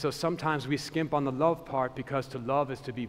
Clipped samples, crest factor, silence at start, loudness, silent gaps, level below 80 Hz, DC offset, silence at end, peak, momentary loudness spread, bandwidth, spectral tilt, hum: under 0.1%; 18 dB; 0 s; -30 LUFS; none; -60 dBFS; under 0.1%; 0 s; -12 dBFS; 6 LU; 16 kHz; -6 dB/octave; none